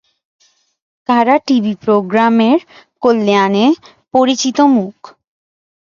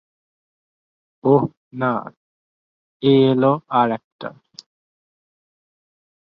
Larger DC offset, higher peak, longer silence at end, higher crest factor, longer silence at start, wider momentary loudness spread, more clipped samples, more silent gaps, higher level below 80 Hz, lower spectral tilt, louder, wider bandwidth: neither; about the same, 0 dBFS vs -2 dBFS; second, 0.95 s vs 2.1 s; second, 14 dB vs 20 dB; second, 1.1 s vs 1.25 s; second, 6 LU vs 16 LU; neither; second, none vs 1.57-1.71 s, 2.17-3.00 s, 4.04-4.19 s; about the same, -60 dBFS vs -64 dBFS; second, -5 dB/octave vs -8.5 dB/octave; first, -13 LUFS vs -19 LUFS; about the same, 7.4 kHz vs 6.8 kHz